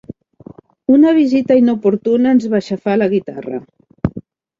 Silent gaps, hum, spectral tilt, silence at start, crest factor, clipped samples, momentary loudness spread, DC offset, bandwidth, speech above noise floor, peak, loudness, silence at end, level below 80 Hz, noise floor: none; none; -8 dB/octave; 0.9 s; 14 dB; under 0.1%; 15 LU; under 0.1%; 7.4 kHz; 26 dB; -2 dBFS; -14 LUFS; 0.4 s; -46 dBFS; -40 dBFS